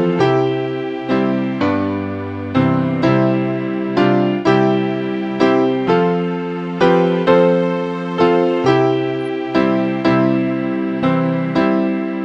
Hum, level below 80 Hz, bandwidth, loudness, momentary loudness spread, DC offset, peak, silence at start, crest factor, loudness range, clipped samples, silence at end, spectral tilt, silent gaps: none; -54 dBFS; 7.8 kHz; -16 LUFS; 7 LU; under 0.1%; 0 dBFS; 0 s; 16 dB; 2 LU; under 0.1%; 0 s; -8 dB/octave; none